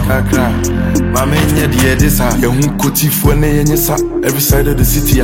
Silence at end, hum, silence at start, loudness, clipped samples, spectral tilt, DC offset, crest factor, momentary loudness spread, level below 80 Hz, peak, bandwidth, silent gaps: 0 s; none; 0 s; -12 LUFS; under 0.1%; -5 dB/octave; under 0.1%; 10 dB; 3 LU; -18 dBFS; 0 dBFS; 17 kHz; none